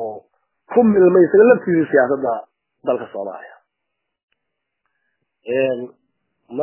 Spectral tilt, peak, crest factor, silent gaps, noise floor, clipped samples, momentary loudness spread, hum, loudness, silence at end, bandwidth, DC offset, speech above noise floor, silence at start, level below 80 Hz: -11.5 dB/octave; 0 dBFS; 18 dB; 4.23-4.28 s; -78 dBFS; under 0.1%; 19 LU; none; -16 LUFS; 0 s; 3.2 kHz; under 0.1%; 63 dB; 0 s; -62 dBFS